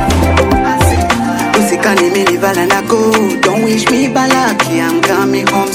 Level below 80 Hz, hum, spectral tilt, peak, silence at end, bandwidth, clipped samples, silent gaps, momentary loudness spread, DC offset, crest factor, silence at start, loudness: -28 dBFS; none; -4.5 dB/octave; 0 dBFS; 0 s; 17 kHz; under 0.1%; none; 2 LU; under 0.1%; 10 dB; 0 s; -11 LUFS